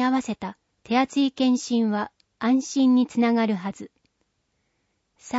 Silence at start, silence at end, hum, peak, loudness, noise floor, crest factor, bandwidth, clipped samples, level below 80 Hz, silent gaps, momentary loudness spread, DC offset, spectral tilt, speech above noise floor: 0 s; 0 s; none; -10 dBFS; -23 LUFS; -73 dBFS; 14 dB; 8 kHz; under 0.1%; -68 dBFS; none; 14 LU; under 0.1%; -5 dB/octave; 51 dB